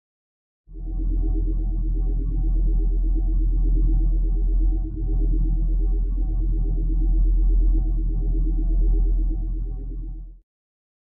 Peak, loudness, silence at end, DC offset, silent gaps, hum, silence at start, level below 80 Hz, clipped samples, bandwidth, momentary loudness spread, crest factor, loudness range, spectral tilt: -12 dBFS; -26 LUFS; 0.7 s; under 0.1%; none; none; 0.7 s; -20 dBFS; under 0.1%; 0.8 kHz; 8 LU; 10 dB; 2 LU; -14.5 dB/octave